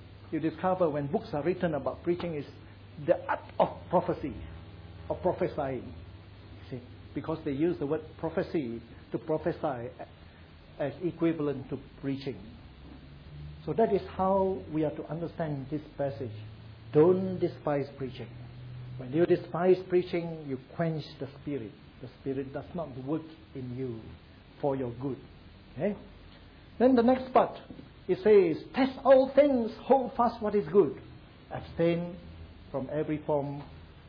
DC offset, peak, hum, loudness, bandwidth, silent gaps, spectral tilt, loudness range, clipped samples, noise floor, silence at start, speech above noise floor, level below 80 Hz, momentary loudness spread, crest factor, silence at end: under 0.1%; -12 dBFS; none; -30 LUFS; 5.4 kHz; none; -10 dB/octave; 11 LU; under 0.1%; -52 dBFS; 0 s; 23 dB; -56 dBFS; 22 LU; 20 dB; 0 s